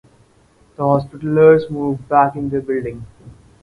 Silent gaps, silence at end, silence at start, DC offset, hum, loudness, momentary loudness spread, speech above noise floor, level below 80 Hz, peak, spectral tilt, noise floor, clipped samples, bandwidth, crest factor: none; 0.3 s; 0.8 s; under 0.1%; none; -16 LUFS; 12 LU; 37 dB; -48 dBFS; 0 dBFS; -9.5 dB/octave; -53 dBFS; under 0.1%; 4.9 kHz; 18 dB